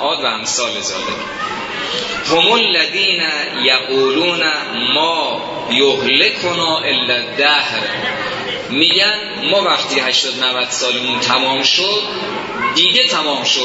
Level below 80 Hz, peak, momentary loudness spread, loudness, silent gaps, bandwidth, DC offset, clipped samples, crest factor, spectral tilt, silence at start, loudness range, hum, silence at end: -54 dBFS; 0 dBFS; 9 LU; -14 LUFS; none; 8 kHz; under 0.1%; under 0.1%; 16 dB; -1.5 dB/octave; 0 s; 1 LU; none; 0 s